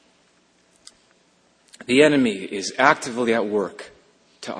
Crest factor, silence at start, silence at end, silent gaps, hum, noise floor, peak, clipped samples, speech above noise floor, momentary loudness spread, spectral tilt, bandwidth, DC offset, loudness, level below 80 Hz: 24 dB; 1.9 s; 0 s; none; none; -60 dBFS; 0 dBFS; under 0.1%; 41 dB; 20 LU; -4 dB/octave; 10.5 kHz; under 0.1%; -20 LUFS; -64 dBFS